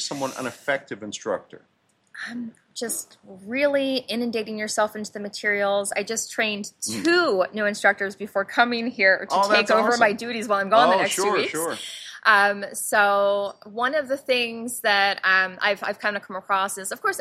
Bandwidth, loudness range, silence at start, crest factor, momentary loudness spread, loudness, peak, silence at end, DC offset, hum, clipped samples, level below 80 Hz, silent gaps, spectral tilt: 15.5 kHz; 8 LU; 0 s; 20 dB; 13 LU; -22 LUFS; -2 dBFS; 0 s; under 0.1%; none; under 0.1%; -72 dBFS; none; -2.5 dB/octave